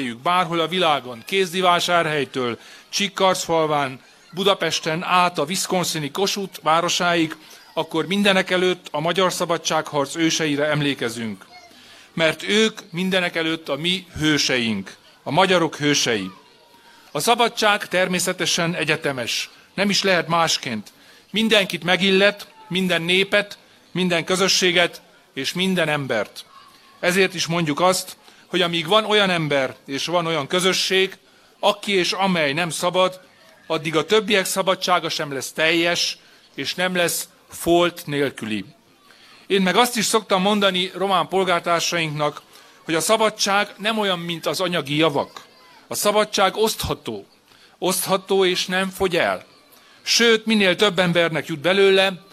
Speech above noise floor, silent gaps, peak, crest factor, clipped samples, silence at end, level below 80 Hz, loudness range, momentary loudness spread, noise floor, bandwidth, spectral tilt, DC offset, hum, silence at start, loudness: 32 dB; none; 0 dBFS; 22 dB; under 0.1%; 0.15 s; -58 dBFS; 3 LU; 10 LU; -52 dBFS; 15.5 kHz; -3.5 dB/octave; under 0.1%; none; 0 s; -20 LUFS